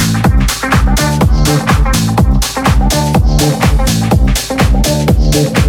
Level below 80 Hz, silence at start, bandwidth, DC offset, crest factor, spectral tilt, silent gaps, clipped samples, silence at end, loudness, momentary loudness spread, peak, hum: -14 dBFS; 0 s; 18 kHz; under 0.1%; 10 dB; -5 dB/octave; none; under 0.1%; 0 s; -11 LUFS; 2 LU; 0 dBFS; none